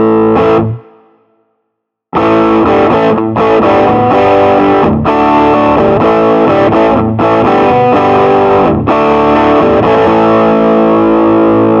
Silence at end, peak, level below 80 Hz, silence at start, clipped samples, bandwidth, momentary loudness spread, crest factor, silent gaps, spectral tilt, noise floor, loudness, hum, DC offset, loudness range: 0 s; 0 dBFS; -34 dBFS; 0 s; under 0.1%; 7 kHz; 2 LU; 8 dB; none; -8.5 dB/octave; -70 dBFS; -8 LUFS; none; under 0.1%; 3 LU